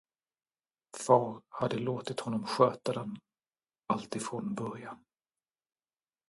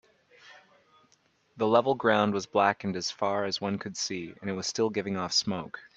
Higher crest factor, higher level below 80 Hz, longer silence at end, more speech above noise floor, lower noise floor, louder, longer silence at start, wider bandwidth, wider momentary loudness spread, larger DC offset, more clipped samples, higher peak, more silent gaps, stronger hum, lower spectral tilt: about the same, 24 dB vs 22 dB; about the same, -74 dBFS vs -72 dBFS; first, 1.35 s vs 0.1 s; first, over 58 dB vs 39 dB; first, under -90 dBFS vs -68 dBFS; second, -32 LUFS vs -28 LUFS; first, 0.95 s vs 0.45 s; first, 11.5 kHz vs 8.6 kHz; first, 19 LU vs 9 LU; neither; neither; about the same, -10 dBFS vs -8 dBFS; neither; neither; first, -5.5 dB/octave vs -4 dB/octave